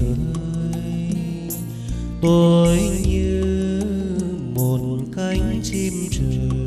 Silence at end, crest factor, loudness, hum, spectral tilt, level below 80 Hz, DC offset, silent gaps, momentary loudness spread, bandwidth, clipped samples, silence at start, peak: 0 s; 16 dB; -21 LUFS; none; -6.5 dB/octave; -30 dBFS; under 0.1%; none; 11 LU; 14 kHz; under 0.1%; 0 s; -4 dBFS